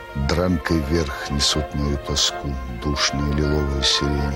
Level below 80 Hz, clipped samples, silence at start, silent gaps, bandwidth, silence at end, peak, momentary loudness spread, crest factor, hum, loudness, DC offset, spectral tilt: -28 dBFS; under 0.1%; 0 s; none; 16.5 kHz; 0 s; -4 dBFS; 7 LU; 16 dB; none; -21 LUFS; under 0.1%; -4 dB/octave